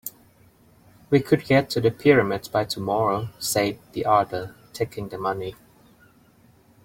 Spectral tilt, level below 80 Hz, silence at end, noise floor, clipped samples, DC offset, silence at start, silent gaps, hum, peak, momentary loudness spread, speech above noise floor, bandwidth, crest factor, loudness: -5.5 dB/octave; -56 dBFS; 1.3 s; -56 dBFS; under 0.1%; under 0.1%; 0.05 s; none; none; -4 dBFS; 12 LU; 34 dB; 16.5 kHz; 20 dB; -23 LUFS